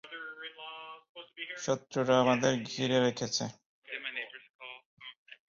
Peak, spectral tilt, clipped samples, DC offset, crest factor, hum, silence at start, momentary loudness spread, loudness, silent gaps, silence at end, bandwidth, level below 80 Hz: -12 dBFS; -4 dB/octave; under 0.1%; under 0.1%; 22 dB; none; 0.05 s; 21 LU; -32 LUFS; 1.09-1.15 s, 3.66-3.82 s, 4.50-4.59 s, 4.85-4.97 s, 5.16-5.26 s; 0.15 s; 7.6 kHz; -72 dBFS